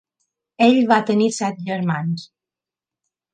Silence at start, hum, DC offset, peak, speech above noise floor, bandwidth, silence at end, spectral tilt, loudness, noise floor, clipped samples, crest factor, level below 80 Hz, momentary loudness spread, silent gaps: 0.6 s; none; under 0.1%; -2 dBFS; 71 dB; 9.8 kHz; 1.1 s; -5.5 dB/octave; -19 LUFS; -89 dBFS; under 0.1%; 18 dB; -68 dBFS; 10 LU; none